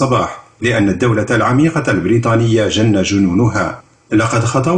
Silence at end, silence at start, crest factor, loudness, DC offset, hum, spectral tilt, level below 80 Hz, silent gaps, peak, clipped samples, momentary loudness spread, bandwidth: 0 s; 0 s; 10 dB; -14 LUFS; under 0.1%; none; -6 dB/octave; -42 dBFS; none; -2 dBFS; under 0.1%; 6 LU; 9.8 kHz